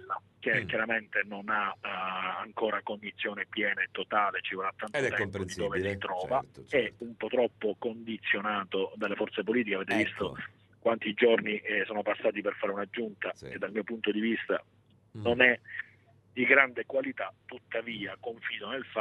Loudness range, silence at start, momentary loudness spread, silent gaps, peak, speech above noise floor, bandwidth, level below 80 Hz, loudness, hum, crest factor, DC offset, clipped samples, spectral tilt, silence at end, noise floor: 4 LU; 0 s; 12 LU; none; -6 dBFS; 30 dB; 12 kHz; -68 dBFS; -31 LUFS; none; 26 dB; under 0.1%; under 0.1%; -5 dB/octave; 0 s; -61 dBFS